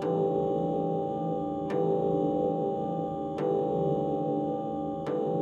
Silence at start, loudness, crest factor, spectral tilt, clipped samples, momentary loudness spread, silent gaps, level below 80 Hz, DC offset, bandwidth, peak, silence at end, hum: 0 s; -30 LUFS; 12 dB; -9.5 dB/octave; under 0.1%; 5 LU; none; -60 dBFS; under 0.1%; 7.6 kHz; -16 dBFS; 0 s; none